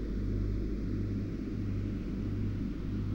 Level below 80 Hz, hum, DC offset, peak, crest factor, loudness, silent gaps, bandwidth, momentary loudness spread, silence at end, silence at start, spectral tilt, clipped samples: -38 dBFS; 50 Hz at -40 dBFS; under 0.1%; -22 dBFS; 12 dB; -36 LUFS; none; 6.8 kHz; 2 LU; 0 s; 0 s; -9.5 dB/octave; under 0.1%